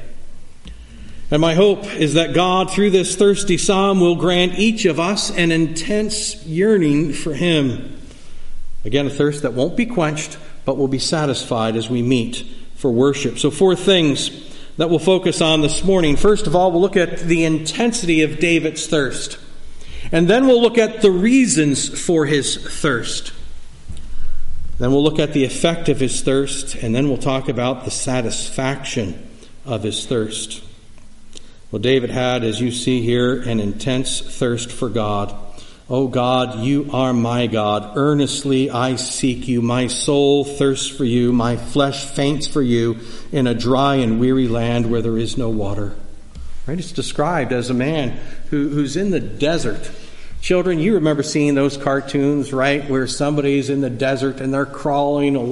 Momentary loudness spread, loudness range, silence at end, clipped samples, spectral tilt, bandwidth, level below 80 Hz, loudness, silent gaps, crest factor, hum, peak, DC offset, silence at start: 10 LU; 6 LU; 0 s; under 0.1%; -5 dB/octave; 11.5 kHz; -32 dBFS; -18 LUFS; none; 16 dB; none; -2 dBFS; under 0.1%; 0 s